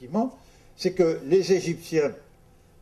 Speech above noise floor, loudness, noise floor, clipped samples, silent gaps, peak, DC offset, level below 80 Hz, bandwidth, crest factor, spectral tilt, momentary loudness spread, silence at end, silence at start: 31 dB; -25 LUFS; -55 dBFS; under 0.1%; none; -10 dBFS; under 0.1%; -58 dBFS; 13.5 kHz; 16 dB; -6 dB/octave; 9 LU; 0.65 s; 0 s